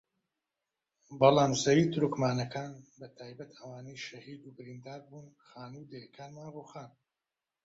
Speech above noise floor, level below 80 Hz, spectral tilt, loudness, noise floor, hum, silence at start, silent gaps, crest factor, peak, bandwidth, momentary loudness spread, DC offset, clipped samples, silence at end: over 58 dB; -68 dBFS; -5.5 dB/octave; -28 LUFS; under -90 dBFS; none; 1.1 s; none; 24 dB; -8 dBFS; 8 kHz; 24 LU; under 0.1%; under 0.1%; 0.75 s